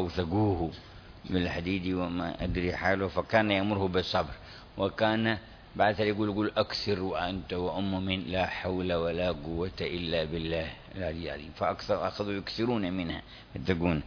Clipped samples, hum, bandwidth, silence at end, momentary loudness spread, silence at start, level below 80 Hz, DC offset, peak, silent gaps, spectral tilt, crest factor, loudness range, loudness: under 0.1%; none; 5.4 kHz; 0 s; 10 LU; 0 s; -48 dBFS; under 0.1%; -8 dBFS; none; -7 dB/octave; 22 dB; 4 LU; -31 LUFS